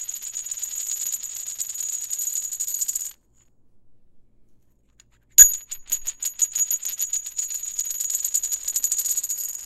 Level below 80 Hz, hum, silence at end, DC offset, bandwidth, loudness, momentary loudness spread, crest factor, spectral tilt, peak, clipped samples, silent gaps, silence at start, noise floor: -56 dBFS; none; 0 s; under 0.1%; 17 kHz; -21 LUFS; 13 LU; 26 dB; 3.5 dB/octave; 0 dBFS; under 0.1%; none; 0 s; -58 dBFS